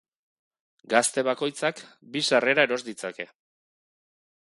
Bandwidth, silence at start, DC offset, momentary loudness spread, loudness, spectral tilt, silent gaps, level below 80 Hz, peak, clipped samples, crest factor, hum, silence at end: 11.5 kHz; 0.9 s; under 0.1%; 16 LU; -25 LUFS; -2.5 dB/octave; none; -78 dBFS; -4 dBFS; under 0.1%; 24 dB; none; 1.15 s